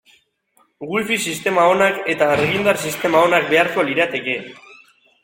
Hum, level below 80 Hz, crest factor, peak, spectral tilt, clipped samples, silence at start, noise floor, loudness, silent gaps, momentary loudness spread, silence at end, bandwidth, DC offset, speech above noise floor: none; -58 dBFS; 16 dB; -2 dBFS; -4 dB/octave; under 0.1%; 0.8 s; -61 dBFS; -17 LUFS; none; 10 LU; 0.5 s; 16.5 kHz; under 0.1%; 43 dB